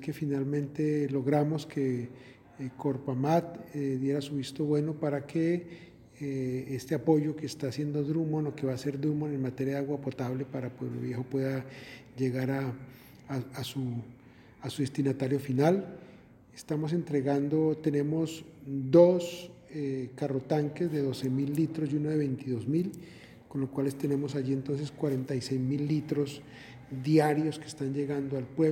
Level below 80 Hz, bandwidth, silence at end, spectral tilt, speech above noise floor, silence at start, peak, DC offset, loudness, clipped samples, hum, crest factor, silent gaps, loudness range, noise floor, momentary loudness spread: -68 dBFS; 17 kHz; 0 s; -7.5 dB/octave; 24 dB; 0 s; -8 dBFS; under 0.1%; -31 LUFS; under 0.1%; none; 22 dB; none; 6 LU; -54 dBFS; 13 LU